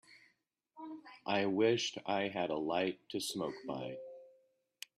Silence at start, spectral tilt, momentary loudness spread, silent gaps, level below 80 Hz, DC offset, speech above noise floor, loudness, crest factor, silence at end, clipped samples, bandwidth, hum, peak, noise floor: 0.1 s; -4 dB/octave; 19 LU; none; -78 dBFS; under 0.1%; 42 dB; -36 LUFS; 20 dB; 0.7 s; under 0.1%; 13 kHz; none; -18 dBFS; -77 dBFS